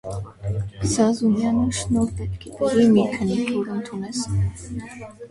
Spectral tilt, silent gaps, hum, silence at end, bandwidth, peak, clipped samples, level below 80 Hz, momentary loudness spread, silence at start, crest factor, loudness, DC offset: -6 dB/octave; none; none; 0.05 s; 11.5 kHz; -6 dBFS; under 0.1%; -40 dBFS; 16 LU; 0.05 s; 16 dB; -22 LUFS; under 0.1%